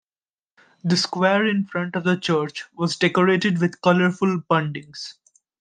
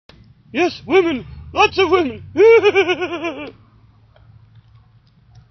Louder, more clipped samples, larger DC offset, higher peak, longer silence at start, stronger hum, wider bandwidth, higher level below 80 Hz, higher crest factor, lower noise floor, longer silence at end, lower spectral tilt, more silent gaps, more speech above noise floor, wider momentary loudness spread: second, -21 LUFS vs -16 LUFS; neither; neither; about the same, -2 dBFS vs 0 dBFS; first, 0.85 s vs 0.55 s; neither; first, 9.4 kHz vs 6.4 kHz; second, -66 dBFS vs -48 dBFS; about the same, 20 dB vs 18 dB; first, under -90 dBFS vs -51 dBFS; second, 0.5 s vs 2 s; first, -5.5 dB/octave vs -2.5 dB/octave; neither; first, over 69 dB vs 36 dB; second, 12 LU vs 16 LU